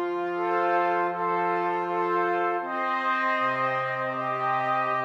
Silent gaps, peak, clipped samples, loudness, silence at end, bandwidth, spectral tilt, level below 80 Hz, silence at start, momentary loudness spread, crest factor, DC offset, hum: none; -14 dBFS; under 0.1%; -26 LUFS; 0 s; 7.4 kHz; -6.5 dB/octave; -84 dBFS; 0 s; 4 LU; 12 dB; under 0.1%; none